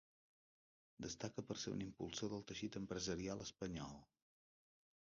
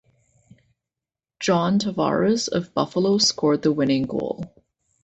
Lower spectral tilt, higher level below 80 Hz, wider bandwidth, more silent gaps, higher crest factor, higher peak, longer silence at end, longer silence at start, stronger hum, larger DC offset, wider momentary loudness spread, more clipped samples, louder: about the same, -5 dB/octave vs -4.5 dB/octave; second, -70 dBFS vs -58 dBFS; second, 7.2 kHz vs 8.2 kHz; neither; about the same, 20 dB vs 18 dB; second, -30 dBFS vs -6 dBFS; first, 1 s vs 0.55 s; second, 1 s vs 1.4 s; neither; neither; about the same, 7 LU vs 9 LU; neither; second, -48 LUFS vs -21 LUFS